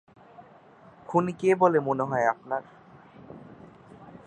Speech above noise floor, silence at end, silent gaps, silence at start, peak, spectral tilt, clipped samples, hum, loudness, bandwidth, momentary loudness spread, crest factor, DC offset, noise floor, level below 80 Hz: 28 dB; 0.1 s; none; 0.4 s; -6 dBFS; -7.5 dB/octave; under 0.1%; none; -25 LUFS; 9.6 kHz; 25 LU; 22 dB; under 0.1%; -53 dBFS; -68 dBFS